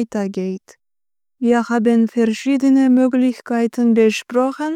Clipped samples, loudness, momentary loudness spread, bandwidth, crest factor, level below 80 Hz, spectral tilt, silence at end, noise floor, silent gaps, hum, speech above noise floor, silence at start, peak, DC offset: under 0.1%; -17 LUFS; 9 LU; 11 kHz; 12 dB; -66 dBFS; -6 dB/octave; 0 s; under -90 dBFS; none; none; over 74 dB; 0 s; -4 dBFS; under 0.1%